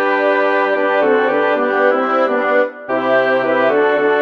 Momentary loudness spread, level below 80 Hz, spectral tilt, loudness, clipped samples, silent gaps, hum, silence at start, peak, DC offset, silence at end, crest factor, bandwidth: 2 LU; -64 dBFS; -6 dB/octave; -15 LUFS; under 0.1%; none; none; 0 s; 0 dBFS; under 0.1%; 0 s; 14 dB; 6.6 kHz